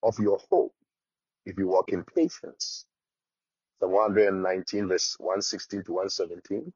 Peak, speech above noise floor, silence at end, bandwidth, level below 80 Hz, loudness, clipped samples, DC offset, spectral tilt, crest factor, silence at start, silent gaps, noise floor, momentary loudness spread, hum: -10 dBFS; over 63 dB; 0.05 s; 7.4 kHz; -70 dBFS; -27 LUFS; under 0.1%; under 0.1%; -3.5 dB/octave; 18 dB; 0.05 s; none; under -90 dBFS; 11 LU; none